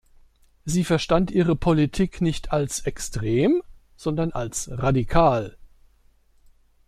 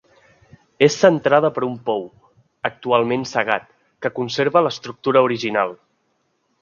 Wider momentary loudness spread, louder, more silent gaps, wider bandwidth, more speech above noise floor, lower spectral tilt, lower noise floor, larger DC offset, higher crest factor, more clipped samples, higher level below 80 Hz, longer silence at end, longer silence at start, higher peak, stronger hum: second, 9 LU vs 12 LU; second, -23 LUFS vs -19 LUFS; neither; first, 14.5 kHz vs 7.4 kHz; second, 36 dB vs 49 dB; about the same, -6 dB/octave vs -5 dB/octave; second, -58 dBFS vs -68 dBFS; neither; about the same, 20 dB vs 20 dB; neither; first, -38 dBFS vs -64 dBFS; first, 1.2 s vs 0.85 s; second, 0.65 s vs 0.8 s; second, -4 dBFS vs 0 dBFS; neither